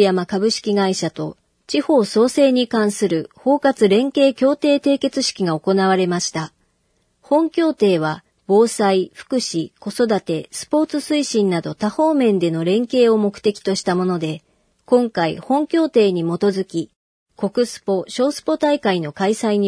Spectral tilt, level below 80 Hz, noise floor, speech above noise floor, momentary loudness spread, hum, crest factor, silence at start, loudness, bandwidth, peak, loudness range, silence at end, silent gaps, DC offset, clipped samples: -5 dB/octave; -64 dBFS; -65 dBFS; 47 dB; 8 LU; none; 16 dB; 0 s; -18 LUFS; 11 kHz; -2 dBFS; 3 LU; 0 s; 16.96-17.26 s; under 0.1%; under 0.1%